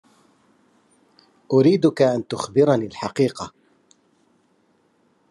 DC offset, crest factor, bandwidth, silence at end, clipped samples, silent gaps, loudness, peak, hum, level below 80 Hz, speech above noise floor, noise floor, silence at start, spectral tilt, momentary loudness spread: under 0.1%; 18 dB; 11.5 kHz; 1.85 s; under 0.1%; none; -20 LUFS; -4 dBFS; none; -70 dBFS; 44 dB; -63 dBFS; 1.5 s; -7 dB/octave; 11 LU